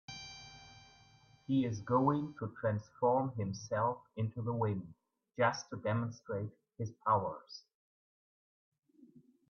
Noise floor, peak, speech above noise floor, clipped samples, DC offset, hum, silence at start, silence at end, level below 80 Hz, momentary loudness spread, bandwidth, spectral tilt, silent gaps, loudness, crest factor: -64 dBFS; -18 dBFS; 29 dB; under 0.1%; under 0.1%; none; 0.1 s; 0.45 s; -72 dBFS; 19 LU; 6.8 kHz; -7 dB/octave; 7.75-8.72 s; -36 LUFS; 20 dB